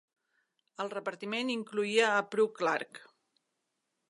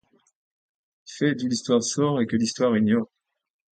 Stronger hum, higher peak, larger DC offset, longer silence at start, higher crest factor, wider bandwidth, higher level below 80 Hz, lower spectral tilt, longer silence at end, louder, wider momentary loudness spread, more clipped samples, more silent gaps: neither; second, -12 dBFS vs -8 dBFS; neither; second, 0.8 s vs 1.1 s; first, 22 dB vs 16 dB; first, 11.5 kHz vs 9.2 kHz; second, -88 dBFS vs -64 dBFS; second, -3.5 dB/octave vs -5 dB/octave; first, 1.1 s vs 0.7 s; second, -32 LUFS vs -23 LUFS; first, 11 LU vs 5 LU; neither; neither